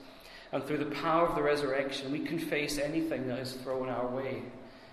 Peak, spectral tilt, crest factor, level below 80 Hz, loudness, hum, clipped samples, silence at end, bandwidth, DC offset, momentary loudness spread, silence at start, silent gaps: -16 dBFS; -5 dB/octave; 18 dB; -58 dBFS; -33 LUFS; none; under 0.1%; 0 s; 14 kHz; under 0.1%; 12 LU; 0 s; none